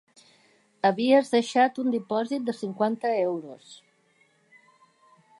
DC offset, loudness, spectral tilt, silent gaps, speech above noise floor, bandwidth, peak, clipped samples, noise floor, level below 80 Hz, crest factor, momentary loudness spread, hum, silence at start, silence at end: under 0.1%; -25 LUFS; -5 dB/octave; none; 40 dB; 11.5 kHz; -8 dBFS; under 0.1%; -65 dBFS; -82 dBFS; 20 dB; 11 LU; none; 0.85 s; 1.65 s